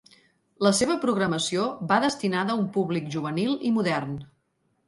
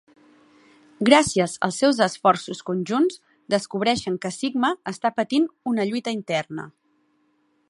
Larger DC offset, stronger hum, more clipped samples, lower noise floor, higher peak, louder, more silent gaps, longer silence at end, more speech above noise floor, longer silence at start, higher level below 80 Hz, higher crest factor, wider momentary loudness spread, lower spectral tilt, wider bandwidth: neither; neither; neither; first, -72 dBFS vs -66 dBFS; second, -6 dBFS vs 0 dBFS; second, -25 LUFS vs -22 LUFS; neither; second, 0.65 s vs 1 s; about the same, 47 dB vs 44 dB; second, 0.6 s vs 1 s; about the same, -64 dBFS vs -60 dBFS; about the same, 20 dB vs 24 dB; second, 6 LU vs 11 LU; about the same, -4.5 dB/octave vs -4.5 dB/octave; about the same, 11.5 kHz vs 11.5 kHz